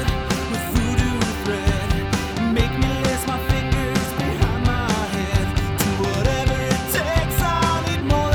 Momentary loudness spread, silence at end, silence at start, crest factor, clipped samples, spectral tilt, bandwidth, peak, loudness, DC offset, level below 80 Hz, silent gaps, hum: 3 LU; 0 s; 0 s; 18 dB; under 0.1%; -5 dB/octave; over 20 kHz; -2 dBFS; -21 LUFS; under 0.1%; -28 dBFS; none; none